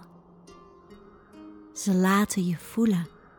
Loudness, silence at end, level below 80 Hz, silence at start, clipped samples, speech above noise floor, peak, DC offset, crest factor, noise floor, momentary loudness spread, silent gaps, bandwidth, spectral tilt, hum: -25 LUFS; 0.3 s; -62 dBFS; 0 s; under 0.1%; 27 dB; -12 dBFS; under 0.1%; 16 dB; -52 dBFS; 21 LU; none; over 20 kHz; -5.5 dB/octave; none